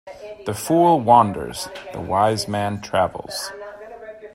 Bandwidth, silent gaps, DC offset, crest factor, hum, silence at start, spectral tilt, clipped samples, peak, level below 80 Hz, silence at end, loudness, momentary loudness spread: 16 kHz; none; under 0.1%; 20 dB; none; 0.05 s; -5 dB/octave; under 0.1%; 0 dBFS; -54 dBFS; 0.05 s; -20 LUFS; 22 LU